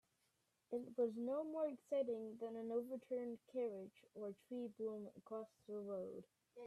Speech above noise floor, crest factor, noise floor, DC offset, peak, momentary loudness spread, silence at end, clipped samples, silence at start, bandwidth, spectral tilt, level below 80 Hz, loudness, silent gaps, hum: 38 dB; 16 dB; -84 dBFS; under 0.1%; -30 dBFS; 11 LU; 0 s; under 0.1%; 0.7 s; 13.5 kHz; -7.5 dB/octave; under -90 dBFS; -47 LUFS; none; none